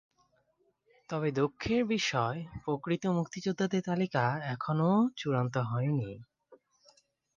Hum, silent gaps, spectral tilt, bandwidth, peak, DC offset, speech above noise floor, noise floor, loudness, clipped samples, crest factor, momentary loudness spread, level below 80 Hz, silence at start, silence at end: none; none; -6.5 dB/octave; 7.4 kHz; -14 dBFS; under 0.1%; 43 dB; -73 dBFS; -31 LUFS; under 0.1%; 20 dB; 7 LU; -62 dBFS; 1.1 s; 0.8 s